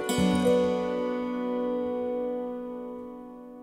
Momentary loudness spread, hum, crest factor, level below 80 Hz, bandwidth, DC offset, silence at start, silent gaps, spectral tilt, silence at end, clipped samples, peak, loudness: 16 LU; none; 16 dB; -56 dBFS; 16 kHz; under 0.1%; 0 s; none; -6 dB/octave; 0 s; under 0.1%; -12 dBFS; -28 LUFS